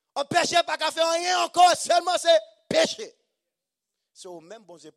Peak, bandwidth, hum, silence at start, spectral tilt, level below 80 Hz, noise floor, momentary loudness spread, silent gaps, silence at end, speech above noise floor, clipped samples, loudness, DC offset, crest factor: -6 dBFS; 14.5 kHz; none; 0.15 s; -1.5 dB/octave; -70 dBFS; -85 dBFS; 21 LU; none; 0.1 s; 62 dB; under 0.1%; -22 LUFS; under 0.1%; 18 dB